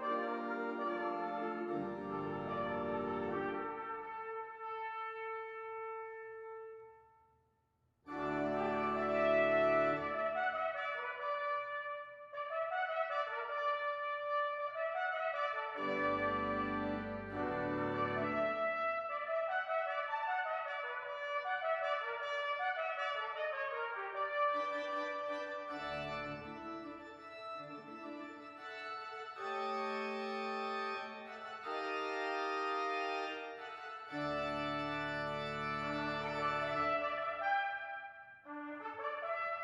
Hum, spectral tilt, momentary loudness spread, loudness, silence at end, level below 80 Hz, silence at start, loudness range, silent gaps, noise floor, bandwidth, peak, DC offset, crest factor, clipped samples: none; -6 dB/octave; 11 LU; -38 LUFS; 0 s; -70 dBFS; 0 s; 9 LU; none; -78 dBFS; 11 kHz; -20 dBFS; under 0.1%; 18 dB; under 0.1%